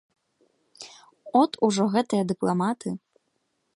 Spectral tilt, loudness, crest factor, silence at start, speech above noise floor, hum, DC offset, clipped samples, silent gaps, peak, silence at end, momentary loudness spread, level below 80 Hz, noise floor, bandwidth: -6 dB/octave; -24 LUFS; 20 dB; 0.8 s; 51 dB; none; under 0.1%; under 0.1%; none; -8 dBFS; 0.8 s; 21 LU; -70 dBFS; -74 dBFS; 11.5 kHz